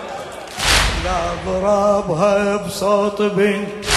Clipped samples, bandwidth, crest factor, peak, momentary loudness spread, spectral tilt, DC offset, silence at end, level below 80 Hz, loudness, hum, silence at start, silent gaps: under 0.1%; 13 kHz; 16 dB; -2 dBFS; 7 LU; -3.5 dB/octave; under 0.1%; 0 s; -30 dBFS; -17 LUFS; none; 0 s; none